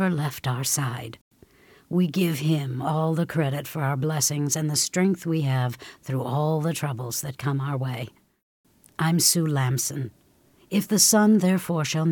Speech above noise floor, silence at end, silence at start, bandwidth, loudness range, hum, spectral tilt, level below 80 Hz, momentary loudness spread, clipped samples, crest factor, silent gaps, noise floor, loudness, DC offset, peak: 35 dB; 0 s; 0 s; 19 kHz; 6 LU; none; -4.5 dB/octave; -64 dBFS; 12 LU; under 0.1%; 22 dB; 1.21-1.31 s, 8.43-8.64 s; -59 dBFS; -24 LUFS; under 0.1%; -4 dBFS